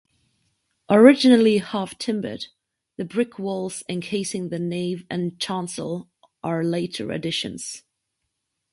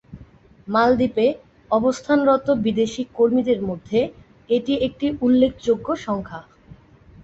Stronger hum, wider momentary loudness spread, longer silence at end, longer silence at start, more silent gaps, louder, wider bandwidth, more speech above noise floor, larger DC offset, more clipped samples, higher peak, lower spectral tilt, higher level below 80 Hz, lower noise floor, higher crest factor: neither; first, 19 LU vs 8 LU; first, 0.95 s vs 0.8 s; first, 0.9 s vs 0.1 s; neither; about the same, -22 LUFS vs -20 LUFS; first, 11.5 kHz vs 8 kHz; first, 57 dB vs 28 dB; neither; neither; first, 0 dBFS vs -4 dBFS; about the same, -5 dB/octave vs -6 dB/octave; second, -64 dBFS vs -50 dBFS; first, -78 dBFS vs -48 dBFS; first, 22 dB vs 16 dB